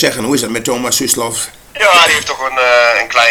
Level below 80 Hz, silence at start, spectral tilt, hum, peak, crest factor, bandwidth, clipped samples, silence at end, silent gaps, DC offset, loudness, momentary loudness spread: -46 dBFS; 0 s; -1.5 dB/octave; none; 0 dBFS; 12 dB; over 20 kHz; 0.3%; 0 s; none; under 0.1%; -11 LUFS; 9 LU